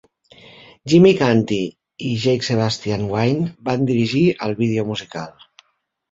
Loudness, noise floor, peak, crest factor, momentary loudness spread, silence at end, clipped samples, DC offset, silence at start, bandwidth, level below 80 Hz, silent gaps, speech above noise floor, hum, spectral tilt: -18 LUFS; -67 dBFS; -2 dBFS; 18 dB; 16 LU; 0.8 s; under 0.1%; under 0.1%; 0.85 s; 7.8 kHz; -52 dBFS; none; 50 dB; none; -6.5 dB/octave